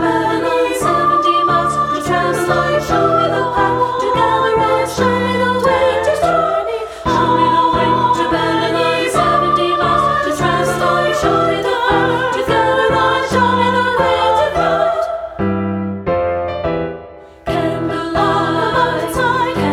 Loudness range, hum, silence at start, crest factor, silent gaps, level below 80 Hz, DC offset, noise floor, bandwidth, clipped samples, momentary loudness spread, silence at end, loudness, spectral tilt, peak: 4 LU; none; 0 s; 12 dB; none; -38 dBFS; under 0.1%; -35 dBFS; 16 kHz; under 0.1%; 6 LU; 0 s; -15 LUFS; -5 dB/octave; -2 dBFS